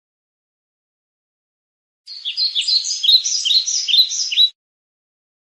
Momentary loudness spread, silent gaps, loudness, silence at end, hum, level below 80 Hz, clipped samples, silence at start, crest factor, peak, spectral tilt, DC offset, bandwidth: 6 LU; none; -14 LUFS; 0.95 s; none; under -90 dBFS; under 0.1%; 2.05 s; 18 dB; -2 dBFS; 10 dB/octave; under 0.1%; 13 kHz